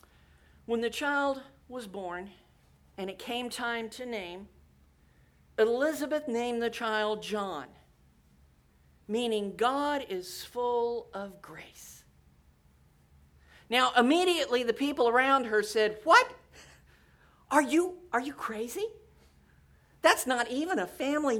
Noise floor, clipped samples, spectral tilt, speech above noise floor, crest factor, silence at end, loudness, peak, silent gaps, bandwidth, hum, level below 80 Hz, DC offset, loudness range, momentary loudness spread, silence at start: -63 dBFS; under 0.1%; -3 dB/octave; 34 dB; 24 dB; 0 s; -29 LUFS; -8 dBFS; none; 19.5 kHz; none; -64 dBFS; under 0.1%; 11 LU; 17 LU; 0.7 s